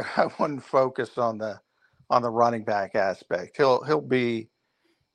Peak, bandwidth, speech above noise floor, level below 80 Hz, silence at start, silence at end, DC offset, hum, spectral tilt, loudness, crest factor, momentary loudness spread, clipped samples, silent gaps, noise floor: -6 dBFS; 10 kHz; 46 dB; -70 dBFS; 0 s; 0.7 s; under 0.1%; none; -6.5 dB/octave; -25 LUFS; 20 dB; 9 LU; under 0.1%; none; -71 dBFS